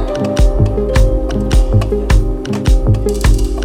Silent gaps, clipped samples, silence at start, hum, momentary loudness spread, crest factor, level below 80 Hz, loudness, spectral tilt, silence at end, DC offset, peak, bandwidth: none; under 0.1%; 0 s; none; 3 LU; 12 dB; -14 dBFS; -14 LUFS; -6.5 dB/octave; 0 s; under 0.1%; 0 dBFS; 15.5 kHz